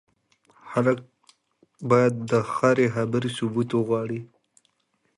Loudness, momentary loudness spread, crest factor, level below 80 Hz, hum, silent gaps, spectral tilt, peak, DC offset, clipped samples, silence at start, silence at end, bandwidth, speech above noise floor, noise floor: -24 LUFS; 10 LU; 20 dB; -64 dBFS; none; none; -7 dB/octave; -4 dBFS; under 0.1%; under 0.1%; 0.65 s; 0.9 s; 11.5 kHz; 48 dB; -71 dBFS